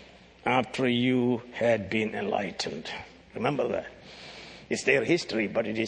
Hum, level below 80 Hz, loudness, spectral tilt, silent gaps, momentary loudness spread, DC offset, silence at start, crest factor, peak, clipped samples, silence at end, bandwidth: none; -62 dBFS; -28 LUFS; -5 dB/octave; none; 19 LU; under 0.1%; 0 s; 20 dB; -8 dBFS; under 0.1%; 0 s; 9.8 kHz